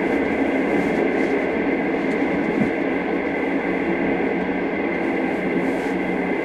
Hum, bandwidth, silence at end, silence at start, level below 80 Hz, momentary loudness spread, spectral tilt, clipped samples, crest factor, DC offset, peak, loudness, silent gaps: none; 11 kHz; 0 s; 0 s; -48 dBFS; 3 LU; -7 dB/octave; under 0.1%; 14 dB; under 0.1%; -8 dBFS; -22 LUFS; none